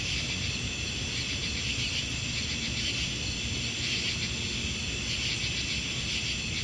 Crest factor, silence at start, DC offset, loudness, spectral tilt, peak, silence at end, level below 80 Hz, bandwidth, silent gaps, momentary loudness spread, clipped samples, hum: 18 dB; 0 s; under 0.1%; -30 LUFS; -2 dB/octave; -14 dBFS; 0 s; -44 dBFS; 11.5 kHz; none; 2 LU; under 0.1%; none